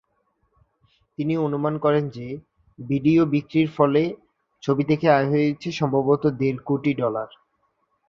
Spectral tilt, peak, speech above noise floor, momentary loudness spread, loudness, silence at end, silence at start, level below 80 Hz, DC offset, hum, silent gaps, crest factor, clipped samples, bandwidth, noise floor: -8 dB/octave; -2 dBFS; 49 dB; 15 LU; -22 LUFS; 0.85 s; 1.2 s; -60 dBFS; under 0.1%; none; none; 20 dB; under 0.1%; 7 kHz; -70 dBFS